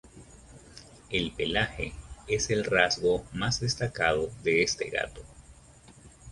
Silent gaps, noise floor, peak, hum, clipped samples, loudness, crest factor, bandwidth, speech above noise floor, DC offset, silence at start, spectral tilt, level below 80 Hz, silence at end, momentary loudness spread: none; -54 dBFS; -6 dBFS; none; under 0.1%; -28 LUFS; 24 dB; 11.5 kHz; 25 dB; under 0.1%; 0.05 s; -3.5 dB/octave; -48 dBFS; 0 s; 22 LU